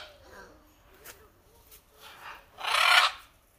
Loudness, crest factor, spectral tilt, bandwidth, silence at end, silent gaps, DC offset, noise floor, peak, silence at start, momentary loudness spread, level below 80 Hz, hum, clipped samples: -23 LUFS; 26 dB; 1.5 dB/octave; 15.5 kHz; 0.4 s; none; under 0.1%; -59 dBFS; -6 dBFS; 0 s; 26 LU; -64 dBFS; none; under 0.1%